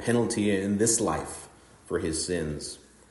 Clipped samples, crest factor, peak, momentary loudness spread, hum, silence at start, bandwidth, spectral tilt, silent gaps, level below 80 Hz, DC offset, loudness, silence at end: under 0.1%; 18 dB; -12 dBFS; 16 LU; none; 0 s; 11.5 kHz; -4 dB/octave; none; -54 dBFS; under 0.1%; -27 LUFS; 0.3 s